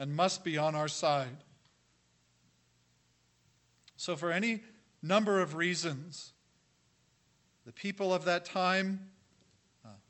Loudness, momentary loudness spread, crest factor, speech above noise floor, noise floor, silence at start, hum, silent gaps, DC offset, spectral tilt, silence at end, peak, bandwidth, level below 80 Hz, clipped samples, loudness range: -33 LUFS; 13 LU; 20 dB; 39 dB; -71 dBFS; 0 s; 60 Hz at -65 dBFS; none; under 0.1%; -4.5 dB/octave; 0.15 s; -14 dBFS; 8.6 kHz; -82 dBFS; under 0.1%; 6 LU